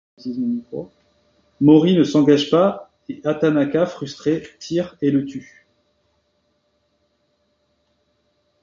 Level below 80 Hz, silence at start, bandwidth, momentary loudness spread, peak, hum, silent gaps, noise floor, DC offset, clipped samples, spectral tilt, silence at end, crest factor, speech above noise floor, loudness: -60 dBFS; 0.25 s; 7.4 kHz; 20 LU; -2 dBFS; none; none; -67 dBFS; under 0.1%; under 0.1%; -7 dB/octave; 3.2 s; 18 dB; 49 dB; -18 LUFS